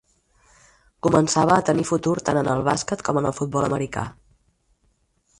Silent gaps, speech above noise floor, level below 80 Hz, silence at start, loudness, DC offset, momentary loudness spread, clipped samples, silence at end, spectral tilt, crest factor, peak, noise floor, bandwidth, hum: none; 45 dB; -52 dBFS; 1.05 s; -22 LUFS; under 0.1%; 8 LU; under 0.1%; 1.25 s; -5.5 dB/octave; 20 dB; -2 dBFS; -66 dBFS; 11.5 kHz; none